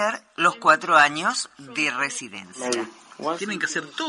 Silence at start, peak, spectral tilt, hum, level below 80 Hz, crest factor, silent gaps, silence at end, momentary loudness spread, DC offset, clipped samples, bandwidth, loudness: 0 s; -4 dBFS; -2 dB/octave; none; -70 dBFS; 20 dB; none; 0 s; 15 LU; under 0.1%; under 0.1%; 11.5 kHz; -22 LUFS